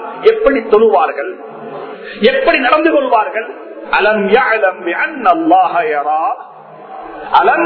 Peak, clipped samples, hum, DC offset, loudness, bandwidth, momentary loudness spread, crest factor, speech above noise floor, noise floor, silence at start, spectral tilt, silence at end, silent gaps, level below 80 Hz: 0 dBFS; 0.3%; none; under 0.1%; -12 LUFS; 5.4 kHz; 17 LU; 12 dB; 22 dB; -34 dBFS; 0 s; -7.5 dB/octave; 0 s; none; -46 dBFS